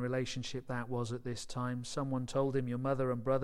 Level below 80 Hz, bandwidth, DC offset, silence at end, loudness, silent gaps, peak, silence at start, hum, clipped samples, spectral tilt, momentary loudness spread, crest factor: -58 dBFS; 12 kHz; under 0.1%; 0 s; -37 LUFS; none; -20 dBFS; 0 s; none; under 0.1%; -6 dB/octave; 6 LU; 16 dB